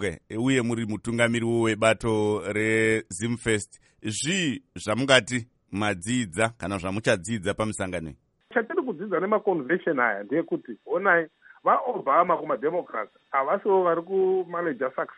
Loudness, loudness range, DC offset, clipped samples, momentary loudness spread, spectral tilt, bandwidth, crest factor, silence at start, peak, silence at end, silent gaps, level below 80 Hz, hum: -25 LUFS; 3 LU; under 0.1%; under 0.1%; 9 LU; -4.5 dB/octave; 11.5 kHz; 22 dB; 0 s; -2 dBFS; 0.05 s; none; -56 dBFS; none